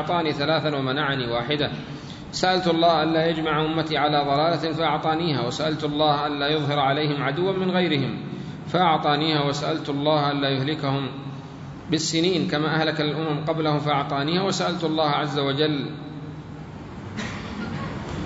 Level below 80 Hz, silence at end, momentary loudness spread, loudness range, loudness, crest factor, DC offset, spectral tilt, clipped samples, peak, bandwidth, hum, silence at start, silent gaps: -52 dBFS; 0 s; 13 LU; 3 LU; -23 LUFS; 18 dB; under 0.1%; -5.5 dB/octave; under 0.1%; -6 dBFS; 8 kHz; none; 0 s; none